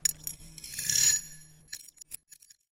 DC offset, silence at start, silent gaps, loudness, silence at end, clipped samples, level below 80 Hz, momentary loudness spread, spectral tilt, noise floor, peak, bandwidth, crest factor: under 0.1%; 0.05 s; none; -27 LUFS; 0.6 s; under 0.1%; -60 dBFS; 22 LU; 1.5 dB/octave; -58 dBFS; -10 dBFS; 16.5 kHz; 24 dB